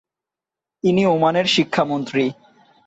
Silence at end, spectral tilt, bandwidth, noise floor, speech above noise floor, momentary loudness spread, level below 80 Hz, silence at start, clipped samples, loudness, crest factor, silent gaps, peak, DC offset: 0.55 s; -5.5 dB/octave; 8.2 kHz; -88 dBFS; 70 dB; 6 LU; -62 dBFS; 0.85 s; under 0.1%; -19 LUFS; 16 dB; none; -4 dBFS; under 0.1%